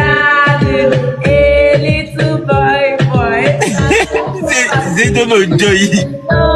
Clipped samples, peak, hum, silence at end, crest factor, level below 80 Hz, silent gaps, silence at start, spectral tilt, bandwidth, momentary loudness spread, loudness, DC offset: under 0.1%; 0 dBFS; none; 0 s; 10 dB; -26 dBFS; none; 0 s; -5 dB/octave; 12.5 kHz; 6 LU; -11 LUFS; under 0.1%